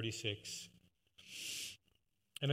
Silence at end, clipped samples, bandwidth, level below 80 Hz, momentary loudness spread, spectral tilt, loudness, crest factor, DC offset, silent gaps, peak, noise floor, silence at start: 0 s; under 0.1%; 16 kHz; -84 dBFS; 16 LU; -3.5 dB/octave; -44 LUFS; 22 dB; under 0.1%; none; -22 dBFS; -80 dBFS; 0 s